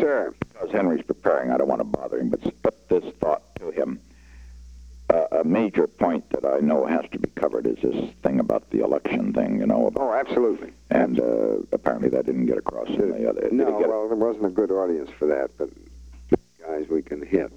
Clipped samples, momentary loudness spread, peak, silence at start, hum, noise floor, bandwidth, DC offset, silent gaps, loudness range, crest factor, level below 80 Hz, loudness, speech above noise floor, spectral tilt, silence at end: under 0.1%; 6 LU; -4 dBFS; 0 s; none; -46 dBFS; 8.6 kHz; under 0.1%; none; 3 LU; 20 dB; -50 dBFS; -24 LUFS; 24 dB; -8 dB/octave; 0 s